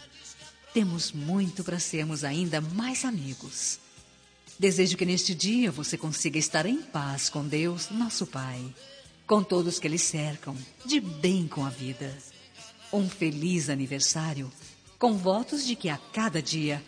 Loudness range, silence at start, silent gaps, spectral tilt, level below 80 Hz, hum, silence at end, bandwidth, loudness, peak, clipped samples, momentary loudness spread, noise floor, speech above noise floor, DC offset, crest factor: 3 LU; 0 s; none; -4 dB/octave; -66 dBFS; none; 0 s; 10.5 kHz; -28 LUFS; -10 dBFS; under 0.1%; 15 LU; -56 dBFS; 27 dB; under 0.1%; 20 dB